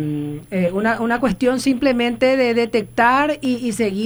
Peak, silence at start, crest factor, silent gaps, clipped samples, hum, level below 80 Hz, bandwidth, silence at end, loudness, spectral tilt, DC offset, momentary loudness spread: -2 dBFS; 0 s; 16 dB; none; under 0.1%; none; -46 dBFS; over 20 kHz; 0 s; -18 LUFS; -5.5 dB/octave; under 0.1%; 6 LU